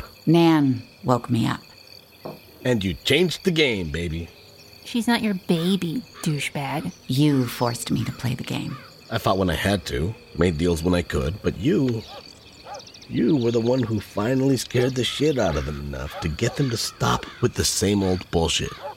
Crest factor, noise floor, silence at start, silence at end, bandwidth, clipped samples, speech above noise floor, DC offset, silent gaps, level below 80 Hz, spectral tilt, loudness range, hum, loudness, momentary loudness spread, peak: 20 dB; -47 dBFS; 0 s; 0 s; 17 kHz; under 0.1%; 25 dB; under 0.1%; none; -42 dBFS; -5 dB/octave; 2 LU; none; -23 LUFS; 12 LU; -2 dBFS